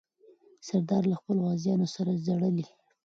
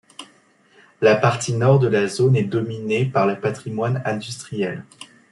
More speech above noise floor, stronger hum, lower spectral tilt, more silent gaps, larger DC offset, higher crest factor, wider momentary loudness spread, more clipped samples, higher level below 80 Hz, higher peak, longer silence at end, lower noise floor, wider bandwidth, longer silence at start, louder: second, 32 dB vs 36 dB; neither; first, -8 dB/octave vs -6 dB/octave; neither; neither; about the same, 14 dB vs 18 dB; second, 6 LU vs 13 LU; neither; second, -72 dBFS vs -62 dBFS; second, -14 dBFS vs -2 dBFS; first, 0.4 s vs 0.25 s; first, -60 dBFS vs -56 dBFS; second, 7.6 kHz vs 12 kHz; first, 0.65 s vs 0.2 s; second, -29 LUFS vs -20 LUFS